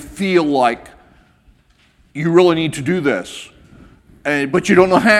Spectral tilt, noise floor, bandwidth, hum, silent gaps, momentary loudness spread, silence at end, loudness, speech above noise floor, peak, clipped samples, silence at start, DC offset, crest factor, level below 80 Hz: -5.5 dB/octave; -54 dBFS; 13 kHz; none; none; 16 LU; 0 s; -15 LUFS; 40 dB; 0 dBFS; under 0.1%; 0 s; under 0.1%; 16 dB; -48 dBFS